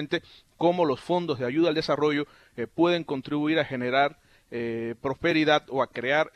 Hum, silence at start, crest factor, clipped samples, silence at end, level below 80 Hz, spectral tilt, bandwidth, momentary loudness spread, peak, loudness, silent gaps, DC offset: none; 0 s; 18 dB; under 0.1%; 0.05 s; -62 dBFS; -6 dB/octave; 9.6 kHz; 8 LU; -8 dBFS; -26 LUFS; none; under 0.1%